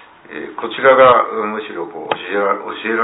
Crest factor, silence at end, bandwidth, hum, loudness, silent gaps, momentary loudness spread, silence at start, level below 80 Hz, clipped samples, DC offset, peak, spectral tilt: 16 dB; 0 s; 4 kHz; none; -15 LUFS; none; 18 LU; 0.3 s; -56 dBFS; under 0.1%; under 0.1%; 0 dBFS; -8.5 dB/octave